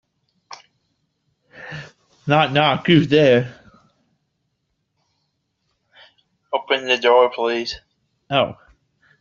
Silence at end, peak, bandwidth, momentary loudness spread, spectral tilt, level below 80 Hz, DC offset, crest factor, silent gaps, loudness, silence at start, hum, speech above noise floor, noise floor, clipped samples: 0.7 s; -2 dBFS; 7.2 kHz; 20 LU; -3.5 dB/octave; -58 dBFS; under 0.1%; 20 dB; none; -17 LUFS; 0.5 s; none; 56 dB; -73 dBFS; under 0.1%